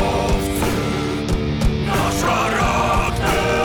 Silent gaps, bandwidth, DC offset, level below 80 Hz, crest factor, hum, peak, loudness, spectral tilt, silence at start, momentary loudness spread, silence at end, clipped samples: none; 20 kHz; under 0.1%; -26 dBFS; 12 dB; none; -6 dBFS; -19 LUFS; -5 dB/octave; 0 s; 4 LU; 0 s; under 0.1%